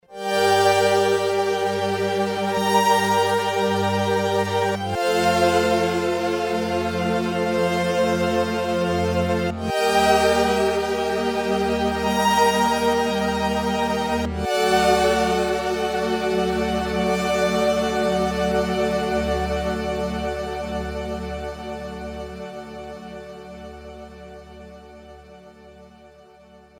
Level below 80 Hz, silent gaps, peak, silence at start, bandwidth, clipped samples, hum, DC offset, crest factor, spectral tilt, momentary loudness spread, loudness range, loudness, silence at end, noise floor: -40 dBFS; none; -4 dBFS; 0.1 s; over 20 kHz; under 0.1%; none; under 0.1%; 18 dB; -4.5 dB/octave; 16 LU; 14 LU; -21 LUFS; 0.75 s; -49 dBFS